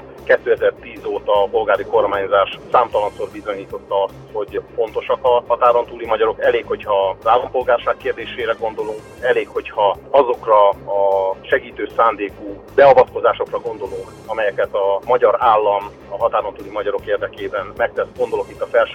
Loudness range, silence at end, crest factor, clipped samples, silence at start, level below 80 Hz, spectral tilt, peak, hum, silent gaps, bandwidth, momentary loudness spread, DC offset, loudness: 4 LU; 0 s; 16 dB; under 0.1%; 0 s; -48 dBFS; -5.5 dB/octave; -2 dBFS; none; none; 9.4 kHz; 12 LU; under 0.1%; -18 LUFS